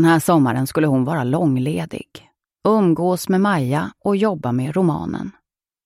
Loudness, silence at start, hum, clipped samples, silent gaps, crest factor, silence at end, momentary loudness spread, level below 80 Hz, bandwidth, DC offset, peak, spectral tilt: -19 LUFS; 0 s; none; under 0.1%; none; 16 dB; 0.55 s; 10 LU; -54 dBFS; 15.5 kHz; under 0.1%; -4 dBFS; -7 dB/octave